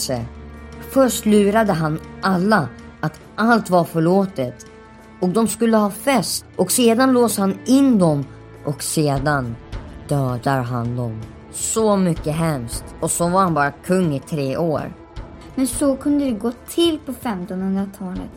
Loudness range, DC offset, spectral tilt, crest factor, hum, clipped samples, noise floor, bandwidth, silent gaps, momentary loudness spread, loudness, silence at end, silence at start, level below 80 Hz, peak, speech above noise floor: 5 LU; under 0.1%; -5 dB/octave; 16 dB; none; under 0.1%; -42 dBFS; 16.5 kHz; none; 15 LU; -19 LUFS; 0 s; 0 s; -42 dBFS; -2 dBFS; 24 dB